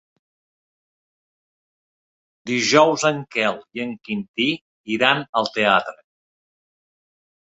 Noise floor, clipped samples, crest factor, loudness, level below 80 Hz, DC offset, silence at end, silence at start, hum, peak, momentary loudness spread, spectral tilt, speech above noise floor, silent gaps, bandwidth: under -90 dBFS; under 0.1%; 22 dB; -20 LUFS; -66 dBFS; under 0.1%; 1.55 s; 2.45 s; none; -2 dBFS; 14 LU; -3.5 dB/octave; over 70 dB; 4.28-4.34 s, 4.61-4.84 s, 5.29-5.33 s; 8.2 kHz